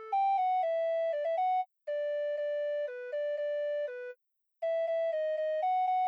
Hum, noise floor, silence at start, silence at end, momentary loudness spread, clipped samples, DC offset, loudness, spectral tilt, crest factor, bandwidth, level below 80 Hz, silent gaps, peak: none; -65 dBFS; 0 s; 0 s; 7 LU; under 0.1%; under 0.1%; -32 LUFS; 1 dB/octave; 8 dB; 6.2 kHz; under -90 dBFS; none; -24 dBFS